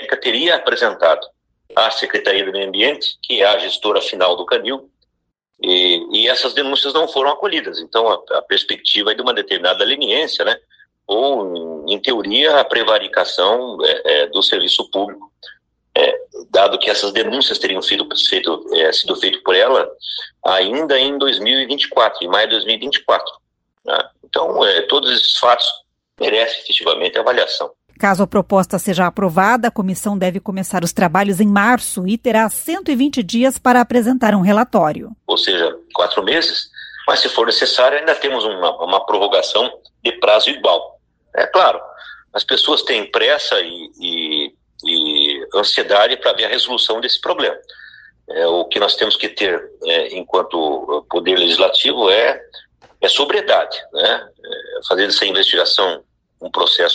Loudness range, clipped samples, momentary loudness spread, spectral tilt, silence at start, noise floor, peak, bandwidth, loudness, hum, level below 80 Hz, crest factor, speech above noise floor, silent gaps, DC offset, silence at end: 2 LU; under 0.1%; 9 LU; -3.5 dB/octave; 0 s; -73 dBFS; 0 dBFS; 16 kHz; -15 LUFS; none; -58 dBFS; 16 dB; 57 dB; none; under 0.1%; 0 s